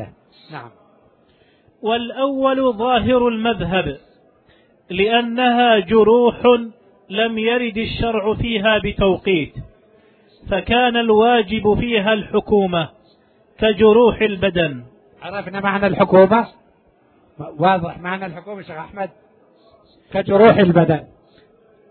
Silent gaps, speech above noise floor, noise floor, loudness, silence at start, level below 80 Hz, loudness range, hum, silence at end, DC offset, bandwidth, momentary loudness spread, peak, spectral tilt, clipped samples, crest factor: none; 39 dB; -55 dBFS; -16 LUFS; 0 s; -42 dBFS; 4 LU; none; 0.85 s; under 0.1%; 4.5 kHz; 18 LU; 0 dBFS; -9.5 dB/octave; under 0.1%; 18 dB